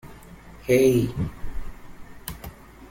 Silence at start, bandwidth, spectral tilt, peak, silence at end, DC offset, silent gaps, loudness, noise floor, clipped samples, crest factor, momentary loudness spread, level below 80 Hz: 0.05 s; 16.5 kHz; -6.5 dB/octave; -8 dBFS; 0 s; under 0.1%; none; -22 LUFS; -45 dBFS; under 0.1%; 18 dB; 24 LU; -40 dBFS